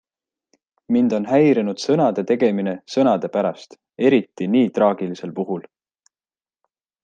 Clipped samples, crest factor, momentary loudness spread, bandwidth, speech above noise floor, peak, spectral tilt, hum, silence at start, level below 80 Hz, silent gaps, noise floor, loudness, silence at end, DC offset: under 0.1%; 18 dB; 10 LU; 8.8 kHz; over 71 dB; -2 dBFS; -7 dB/octave; none; 0.9 s; -68 dBFS; none; under -90 dBFS; -19 LUFS; 1.45 s; under 0.1%